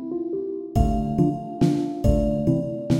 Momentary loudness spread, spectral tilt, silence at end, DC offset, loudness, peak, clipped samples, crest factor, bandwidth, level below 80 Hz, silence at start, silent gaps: 6 LU; -9 dB/octave; 0 s; under 0.1%; -23 LUFS; -4 dBFS; under 0.1%; 18 dB; 16 kHz; -30 dBFS; 0 s; none